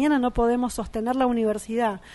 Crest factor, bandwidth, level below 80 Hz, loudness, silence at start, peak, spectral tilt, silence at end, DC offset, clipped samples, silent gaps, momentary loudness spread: 14 dB; 11.5 kHz; -42 dBFS; -24 LUFS; 0 s; -10 dBFS; -5.5 dB/octave; 0 s; under 0.1%; under 0.1%; none; 5 LU